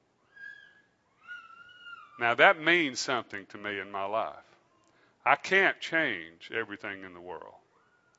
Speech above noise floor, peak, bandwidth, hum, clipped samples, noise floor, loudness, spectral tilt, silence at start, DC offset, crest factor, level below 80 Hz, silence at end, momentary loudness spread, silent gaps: 38 dB; -6 dBFS; 8 kHz; none; under 0.1%; -67 dBFS; -28 LUFS; -3 dB/octave; 0.4 s; under 0.1%; 26 dB; -80 dBFS; 0.7 s; 25 LU; none